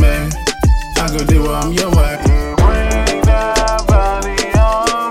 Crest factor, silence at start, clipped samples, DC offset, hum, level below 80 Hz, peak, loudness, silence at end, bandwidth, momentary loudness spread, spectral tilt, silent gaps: 12 dB; 0 s; under 0.1%; under 0.1%; none; -14 dBFS; 0 dBFS; -14 LUFS; 0 s; 15.5 kHz; 3 LU; -5 dB/octave; none